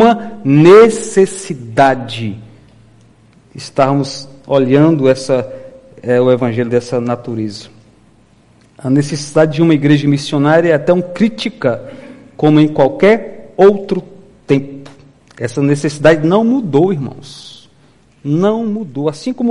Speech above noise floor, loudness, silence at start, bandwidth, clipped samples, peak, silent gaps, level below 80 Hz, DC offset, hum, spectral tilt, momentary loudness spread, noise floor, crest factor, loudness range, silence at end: 37 dB; -12 LUFS; 0 s; 11.5 kHz; 0.2%; 0 dBFS; none; -50 dBFS; under 0.1%; none; -6.5 dB/octave; 16 LU; -49 dBFS; 14 dB; 4 LU; 0 s